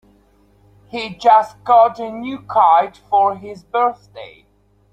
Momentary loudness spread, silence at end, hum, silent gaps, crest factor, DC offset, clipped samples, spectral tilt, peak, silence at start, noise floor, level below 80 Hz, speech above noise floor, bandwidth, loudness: 18 LU; 0.65 s; none; none; 16 dB; under 0.1%; under 0.1%; -5.5 dB/octave; -2 dBFS; 0.95 s; -54 dBFS; -58 dBFS; 38 dB; 8.4 kHz; -16 LUFS